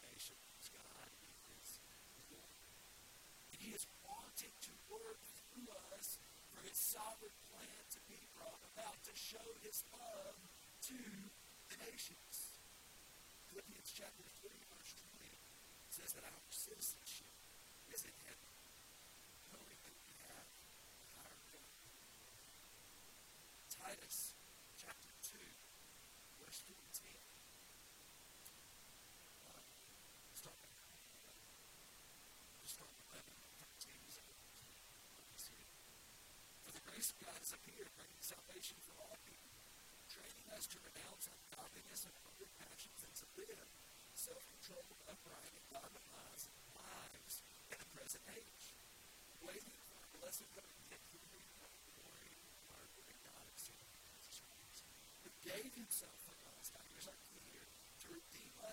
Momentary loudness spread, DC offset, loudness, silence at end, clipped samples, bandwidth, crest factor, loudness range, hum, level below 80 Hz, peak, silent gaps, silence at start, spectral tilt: 11 LU; under 0.1%; -54 LUFS; 0 s; under 0.1%; 16.5 kHz; 26 dB; 10 LU; none; -78 dBFS; -30 dBFS; none; 0 s; -1 dB/octave